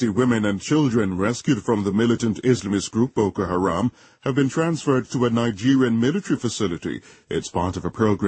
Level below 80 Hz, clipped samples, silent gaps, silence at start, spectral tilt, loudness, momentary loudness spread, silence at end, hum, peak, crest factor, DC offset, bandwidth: -52 dBFS; under 0.1%; none; 0 s; -6 dB/octave; -22 LUFS; 7 LU; 0 s; none; -6 dBFS; 16 dB; under 0.1%; 8.8 kHz